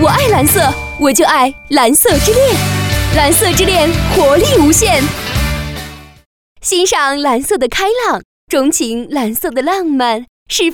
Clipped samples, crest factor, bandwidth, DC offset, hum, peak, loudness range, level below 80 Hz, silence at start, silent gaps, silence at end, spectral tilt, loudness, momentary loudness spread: under 0.1%; 12 dB; over 20 kHz; under 0.1%; none; 0 dBFS; 5 LU; -26 dBFS; 0 s; 6.26-6.56 s, 8.25-8.47 s, 10.28-10.46 s; 0 s; -3.5 dB/octave; -11 LUFS; 9 LU